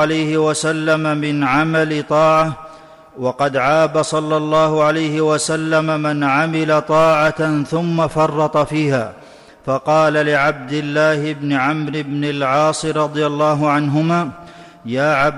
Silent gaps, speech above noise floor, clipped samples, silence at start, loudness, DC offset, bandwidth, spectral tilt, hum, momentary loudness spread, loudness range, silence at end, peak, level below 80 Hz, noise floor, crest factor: none; 24 dB; under 0.1%; 0 s; -16 LUFS; under 0.1%; 12 kHz; -5.5 dB/octave; none; 7 LU; 2 LU; 0 s; -6 dBFS; -52 dBFS; -40 dBFS; 10 dB